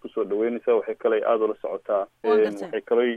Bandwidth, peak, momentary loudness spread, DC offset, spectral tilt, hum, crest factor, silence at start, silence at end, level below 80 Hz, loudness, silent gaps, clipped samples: 6.6 kHz; -10 dBFS; 6 LU; under 0.1%; -6.5 dB/octave; none; 14 dB; 0.05 s; 0 s; -72 dBFS; -24 LUFS; none; under 0.1%